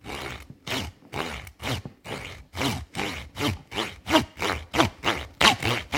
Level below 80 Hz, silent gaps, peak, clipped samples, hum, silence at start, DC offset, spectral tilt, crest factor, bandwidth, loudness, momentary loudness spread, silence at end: -46 dBFS; none; 0 dBFS; under 0.1%; none; 0.05 s; under 0.1%; -3.5 dB/octave; 28 dB; 17 kHz; -27 LUFS; 16 LU; 0 s